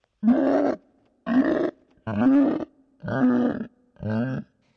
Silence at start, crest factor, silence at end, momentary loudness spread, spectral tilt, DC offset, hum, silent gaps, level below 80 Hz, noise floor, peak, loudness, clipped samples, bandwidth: 0.2 s; 12 dB; 0.35 s; 18 LU; -9 dB/octave; under 0.1%; none; none; -60 dBFS; -58 dBFS; -12 dBFS; -23 LUFS; under 0.1%; 6 kHz